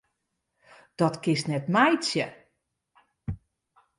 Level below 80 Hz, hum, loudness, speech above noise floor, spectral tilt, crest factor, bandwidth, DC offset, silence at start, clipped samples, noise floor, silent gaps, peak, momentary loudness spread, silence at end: -56 dBFS; none; -25 LUFS; 55 dB; -5 dB/octave; 22 dB; 11.5 kHz; under 0.1%; 1 s; under 0.1%; -80 dBFS; none; -8 dBFS; 19 LU; 0.65 s